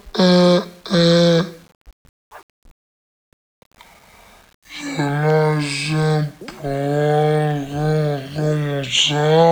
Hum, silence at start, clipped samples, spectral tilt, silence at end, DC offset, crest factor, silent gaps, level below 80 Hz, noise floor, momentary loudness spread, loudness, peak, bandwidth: none; 0.05 s; under 0.1%; -5.5 dB/octave; 0 s; under 0.1%; 16 dB; 1.75-1.85 s, 1.93-2.31 s, 2.43-2.62 s, 2.71-3.71 s, 4.54-4.62 s; -50 dBFS; -47 dBFS; 12 LU; -18 LUFS; -2 dBFS; 15 kHz